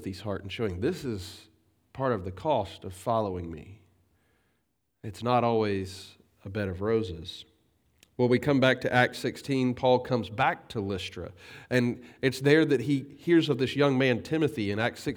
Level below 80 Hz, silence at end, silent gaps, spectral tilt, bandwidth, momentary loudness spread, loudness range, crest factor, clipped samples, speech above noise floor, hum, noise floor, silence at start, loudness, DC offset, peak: -60 dBFS; 0 s; none; -6.5 dB/octave; over 20 kHz; 18 LU; 7 LU; 22 dB; under 0.1%; 49 dB; none; -77 dBFS; 0 s; -28 LUFS; under 0.1%; -6 dBFS